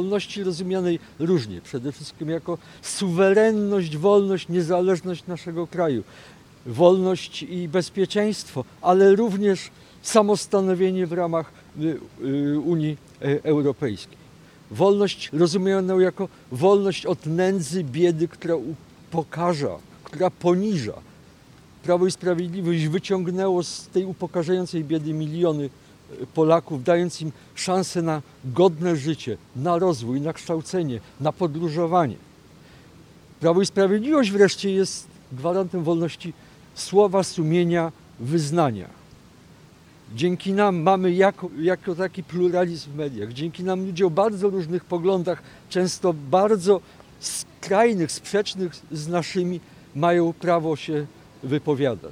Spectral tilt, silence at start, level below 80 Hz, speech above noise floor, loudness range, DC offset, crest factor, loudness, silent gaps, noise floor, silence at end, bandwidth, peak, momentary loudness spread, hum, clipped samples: -6 dB/octave; 0 s; -60 dBFS; 28 dB; 4 LU; under 0.1%; 22 dB; -23 LUFS; none; -50 dBFS; 0 s; 13.5 kHz; -2 dBFS; 12 LU; none; under 0.1%